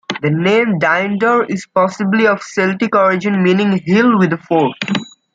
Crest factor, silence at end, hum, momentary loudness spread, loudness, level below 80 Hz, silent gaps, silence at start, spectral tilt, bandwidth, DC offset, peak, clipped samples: 12 dB; 0.3 s; none; 5 LU; -14 LUFS; -60 dBFS; none; 0.1 s; -6.5 dB/octave; 7.8 kHz; under 0.1%; -2 dBFS; under 0.1%